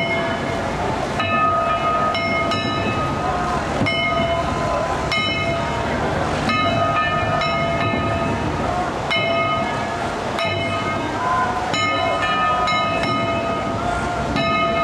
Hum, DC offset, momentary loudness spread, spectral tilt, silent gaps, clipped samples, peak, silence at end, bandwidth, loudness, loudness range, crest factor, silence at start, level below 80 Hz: none; under 0.1%; 4 LU; -5 dB/octave; none; under 0.1%; -6 dBFS; 0 s; 13 kHz; -20 LUFS; 1 LU; 14 dB; 0 s; -38 dBFS